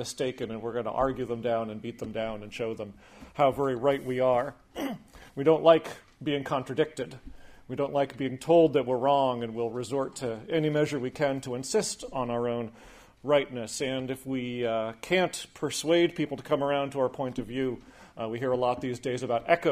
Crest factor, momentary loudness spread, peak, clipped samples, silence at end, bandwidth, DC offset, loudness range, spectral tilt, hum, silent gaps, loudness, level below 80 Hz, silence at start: 22 dB; 12 LU; -6 dBFS; under 0.1%; 0 s; 15.5 kHz; under 0.1%; 4 LU; -5 dB/octave; none; none; -29 LUFS; -58 dBFS; 0 s